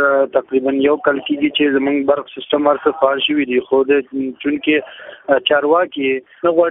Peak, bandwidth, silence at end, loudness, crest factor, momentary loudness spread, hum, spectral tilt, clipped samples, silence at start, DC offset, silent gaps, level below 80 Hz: 0 dBFS; 3.9 kHz; 0 s; -16 LUFS; 16 dB; 6 LU; none; -8.5 dB/octave; under 0.1%; 0 s; under 0.1%; none; -58 dBFS